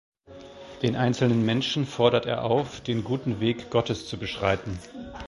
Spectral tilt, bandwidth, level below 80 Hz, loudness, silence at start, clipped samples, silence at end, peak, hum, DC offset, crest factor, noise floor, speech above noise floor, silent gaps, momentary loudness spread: -6 dB/octave; 11.5 kHz; -50 dBFS; -26 LUFS; 0.3 s; under 0.1%; 0 s; -4 dBFS; none; under 0.1%; 22 dB; -46 dBFS; 20 dB; none; 14 LU